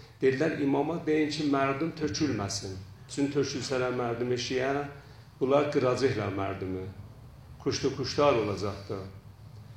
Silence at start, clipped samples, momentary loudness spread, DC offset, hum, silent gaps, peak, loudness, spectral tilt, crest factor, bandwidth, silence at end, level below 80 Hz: 0 s; under 0.1%; 15 LU; under 0.1%; none; none; -10 dBFS; -29 LUFS; -5.5 dB/octave; 18 dB; 12.5 kHz; 0 s; -58 dBFS